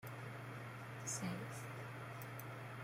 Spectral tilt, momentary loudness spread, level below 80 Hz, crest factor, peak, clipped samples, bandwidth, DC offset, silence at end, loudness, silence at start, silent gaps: -4.5 dB/octave; 7 LU; -76 dBFS; 18 dB; -30 dBFS; under 0.1%; 16.5 kHz; under 0.1%; 0 s; -48 LUFS; 0 s; none